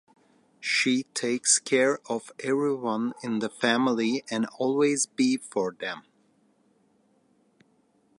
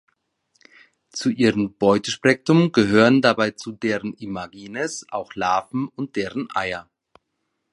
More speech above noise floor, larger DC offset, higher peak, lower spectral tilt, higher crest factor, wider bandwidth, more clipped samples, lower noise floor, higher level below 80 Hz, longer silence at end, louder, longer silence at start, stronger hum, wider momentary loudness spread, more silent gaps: second, 40 dB vs 55 dB; neither; second, -8 dBFS vs -2 dBFS; second, -2.5 dB/octave vs -5.5 dB/octave; about the same, 20 dB vs 20 dB; about the same, 11.5 kHz vs 11.5 kHz; neither; second, -66 dBFS vs -76 dBFS; second, -80 dBFS vs -58 dBFS; first, 2.2 s vs 0.9 s; second, -26 LUFS vs -21 LUFS; second, 0.6 s vs 1.15 s; neither; second, 9 LU vs 15 LU; neither